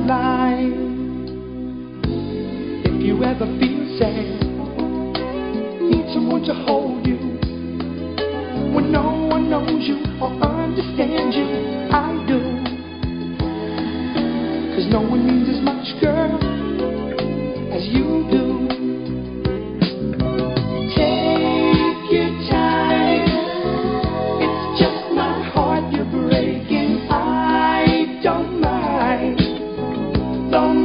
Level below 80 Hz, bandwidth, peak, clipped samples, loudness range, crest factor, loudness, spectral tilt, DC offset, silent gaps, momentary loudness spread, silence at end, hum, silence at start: -34 dBFS; 5.4 kHz; -2 dBFS; under 0.1%; 4 LU; 18 dB; -20 LUFS; -11.5 dB/octave; under 0.1%; none; 8 LU; 0 s; none; 0 s